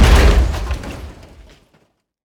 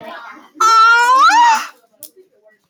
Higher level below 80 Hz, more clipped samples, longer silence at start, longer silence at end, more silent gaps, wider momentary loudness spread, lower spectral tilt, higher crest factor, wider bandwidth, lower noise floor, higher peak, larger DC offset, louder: first, -16 dBFS vs -76 dBFS; neither; about the same, 0 s vs 0 s; first, 1.15 s vs 0.65 s; neither; first, 22 LU vs 17 LU; first, -5.5 dB/octave vs 1.5 dB/octave; first, 16 dB vs 10 dB; second, 16 kHz vs over 20 kHz; first, -59 dBFS vs -51 dBFS; first, 0 dBFS vs -4 dBFS; neither; second, -16 LUFS vs -10 LUFS